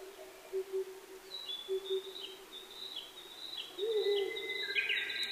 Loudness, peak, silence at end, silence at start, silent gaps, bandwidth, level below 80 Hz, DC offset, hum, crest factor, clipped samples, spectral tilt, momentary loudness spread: -38 LUFS; -20 dBFS; 0 s; 0 s; none; 15.5 kHz; -76 dBFS; under 0.1%; none; 20 dB; under 0.1%; -1 dB/octave; 15 LU